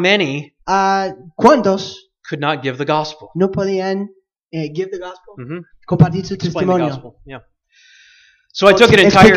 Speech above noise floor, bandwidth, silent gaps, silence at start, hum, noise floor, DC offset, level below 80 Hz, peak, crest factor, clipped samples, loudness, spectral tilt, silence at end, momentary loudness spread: 36 dB; 15 kHz; 4.45-4.49 s; 0 s; none; -51 dBFS; under 0.1%; -44 dBFS; 0 dBFS; 16 dB; 0.1%; -15 LUFS; -5.5 dB/octave; 0 s; 21 LU